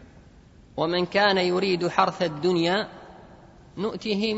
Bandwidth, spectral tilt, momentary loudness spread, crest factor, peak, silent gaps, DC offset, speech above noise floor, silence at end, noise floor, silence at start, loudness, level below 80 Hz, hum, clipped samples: 8 kHz; -5.5 dB/octave; 15 LU; 22 dB; -4 dBFS; none; under 0.1%; 27 dB; 0 s; -51 dBFS; 0 s; -24 LUFS; -56 dBFS; none; under 0.1%